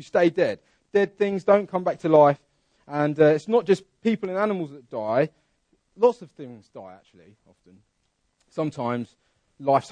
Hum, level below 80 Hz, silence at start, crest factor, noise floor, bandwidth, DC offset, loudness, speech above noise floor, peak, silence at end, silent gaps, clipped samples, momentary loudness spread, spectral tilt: none; -70 dBFS; 0 s; 20 dB; -72 dBFS; 9.8 kHz; under 0.1%; -23 LUFS; 49 dB; -4 dBFS; 0 s; none; under 0.1%; 19 LU; -7.5 dB/octave